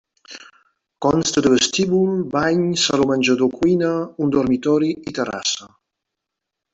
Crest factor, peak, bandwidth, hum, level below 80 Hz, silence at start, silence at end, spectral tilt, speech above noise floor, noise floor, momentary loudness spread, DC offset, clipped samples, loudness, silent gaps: 16 dB; -4 dBFS; 8.2 kHz; none; -52 dBFS; 0.3 s; 1.05 s; -4.5 dB/octave; 64 dB; -82 dBFS; 8 LU; under 0.1%; under 0.1%; -19 LUFS; none